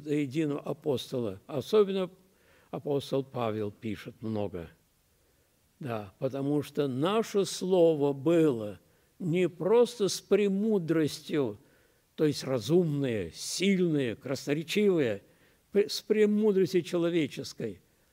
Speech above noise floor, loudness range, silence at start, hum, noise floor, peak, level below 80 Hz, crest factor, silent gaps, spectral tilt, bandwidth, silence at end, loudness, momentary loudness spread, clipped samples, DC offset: 40 dB; 8 LU; 0 s; none; -68 dBFS; -12 dBFS; -70 dBFS; 16 dB; none; -6 dB/octave; 16 kHz; 0.4 s; -29 LUFS; 13 LU; under 0.1%; under 0.1%